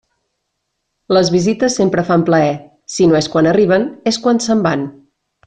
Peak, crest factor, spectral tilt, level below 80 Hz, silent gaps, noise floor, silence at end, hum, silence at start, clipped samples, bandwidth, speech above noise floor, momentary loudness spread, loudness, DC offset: -2 dBFS; 12 dB; -5.5 dB/octave; -50 dBFS; none; -72 dBFS; 0.55 s; none; 1.1 s; under 0.1%; 9.8 kHz; 59 dB; 6 LU; -14 LUFS; under 0.1%